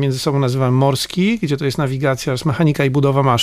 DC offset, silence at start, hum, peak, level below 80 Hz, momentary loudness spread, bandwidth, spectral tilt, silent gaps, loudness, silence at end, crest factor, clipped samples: under 0.1%; 0 s; none; -4 dBFS; -46 dBFS; 4 LU; 15.5 kHz; -6 dB/octave; none; -17 LUFS; 0 s; 12 dB; under 0.1%